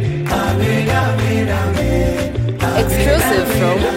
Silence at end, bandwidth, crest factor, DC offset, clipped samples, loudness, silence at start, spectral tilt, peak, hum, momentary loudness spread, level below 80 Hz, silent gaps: 0 s; 17 kHz; 14 dB; under 0.1%; under 0.1%; -16 LUFS; 0 s; -5.5 dB/octave; -2 dBFS; none; 4 LU; -26 dBFS; none